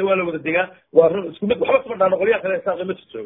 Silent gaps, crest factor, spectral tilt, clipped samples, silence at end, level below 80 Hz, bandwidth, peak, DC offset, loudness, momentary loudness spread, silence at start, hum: none; 18 dB; -10 dB/octave; under 0.1%; 0 s; -58 dBFS; 3.9 kHz; 0 dBFS; under 0.1%; -19 LUFS; 8 LU; 0 s; none